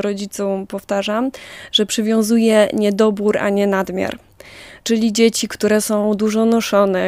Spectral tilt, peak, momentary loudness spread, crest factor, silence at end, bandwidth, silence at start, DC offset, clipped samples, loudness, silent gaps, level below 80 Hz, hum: -4.5 dB/octave; -2 dBFS; 10 LU; 16 dB; 0 s; 16 kHz; 0 s; under 0.1%; under 0.1%; -17 LUFS; none; -54 dBFS; none